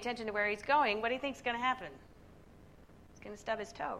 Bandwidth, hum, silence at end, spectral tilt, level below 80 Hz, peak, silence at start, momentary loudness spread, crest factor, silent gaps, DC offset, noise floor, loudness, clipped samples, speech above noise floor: 14 kHz; none; 0 s; -4 dB/octave; -64 dBFS; -18 dBFS; 0 s; 17 LU; 20 dB; none; under 0.1%; -58 dBFS; -34 LUFS; under 0.1%; 23 dB